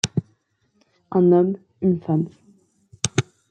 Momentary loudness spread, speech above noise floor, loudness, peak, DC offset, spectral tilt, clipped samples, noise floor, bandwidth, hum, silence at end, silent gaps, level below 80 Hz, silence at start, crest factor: 11 LU; 48 dB; -22 LUFS; -2 dBFS; under 0.1%; -5.5 dB/octave; under 0.1%; -66 dBFS; 10 kHz; none; 0.3 s; none; -60 dBFS; 0.05 s; 22 dB